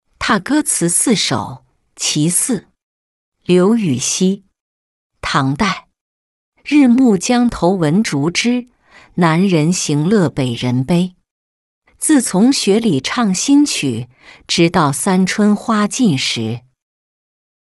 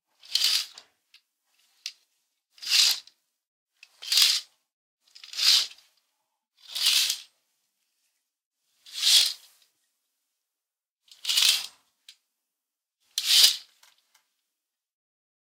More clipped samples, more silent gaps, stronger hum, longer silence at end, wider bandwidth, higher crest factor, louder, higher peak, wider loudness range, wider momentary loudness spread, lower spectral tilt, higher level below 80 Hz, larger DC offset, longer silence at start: neither; first, 2.83-3.32 s, 4.61-5.10 s, 6.01-6.52 s, 11.31-11.82 s vs 3.47-3.66 s, 4.73-4.98 s, 8.46-8.51 s, 10.90-10.96 s; neither; second, 1.15 s vs 1.85 s; second, 12.5 kHz vs 16.5 kHz; second, 14 dB vs 28 dB; first, -14 LUFS vs -21 LUFS; about the same, -2 dBFS vs -2 dBFS; about the same, 3 LU vs 5 LU; second, 10 LU vs 22 LU; first, -4.5 dB/octave vs 6 dB/octave; first, -48 dBFS vs -88 dBFS; neither; about the same, 0.2 s vs 0.3 s